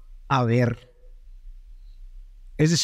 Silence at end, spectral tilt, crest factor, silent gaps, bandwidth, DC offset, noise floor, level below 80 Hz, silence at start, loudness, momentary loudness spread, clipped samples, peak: 0 s; -5 dB/octave; 18 dB; none; 14 kHz; under 0.1%; -45 dBFS; -44 dBFS; 0.1 s; -23 LUFS; 16 LU; under 0.1%; -8 dBFS